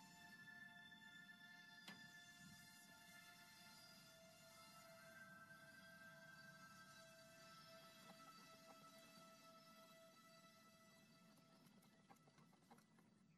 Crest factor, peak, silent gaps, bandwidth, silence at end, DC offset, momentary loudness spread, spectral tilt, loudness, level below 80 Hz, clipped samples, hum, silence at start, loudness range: 22 dB; -44 dBFS; none; 13 kHz; 0 s; under 0.1%; 5 LU; -3 dB/octave; -64 LUFS; under -90 dBFS; under 0.1%; none; 0 s; 5 LU